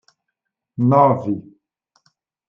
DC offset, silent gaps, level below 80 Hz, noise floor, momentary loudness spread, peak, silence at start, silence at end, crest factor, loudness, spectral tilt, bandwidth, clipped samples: under 0.1%; none; -66 dBFS; -80 dBFS; 15 LU; -2 dBFS; 0.8 s; 1.1 s; 18 dB; -17 LUFS; -11 dB/octave; 6.2 kHz; under 0.1%